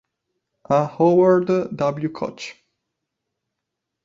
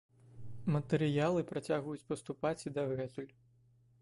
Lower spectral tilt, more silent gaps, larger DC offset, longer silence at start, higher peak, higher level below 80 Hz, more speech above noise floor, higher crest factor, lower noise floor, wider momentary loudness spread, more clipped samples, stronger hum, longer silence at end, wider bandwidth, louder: about the same, -7.5 dB/octave vs -7 dB/octave; neither; neither; first, 0.7 s vs 0.25 s; first, -4 dBFS vs -20 dBFS; first, -62 dBFS vs -68 dBFS; first, 63 dB vs 32 dB; about the same, 18 dB vs 18 dB; first, -81 dBFS vs -67 dBFS; about the same, 14 LU vs 15 LU; neither; neither; first, 1.5 s vs 0.75 s; second, 7.6 kHz vs 11.5 kHz; first, -19 LUFS vs -36 LUFS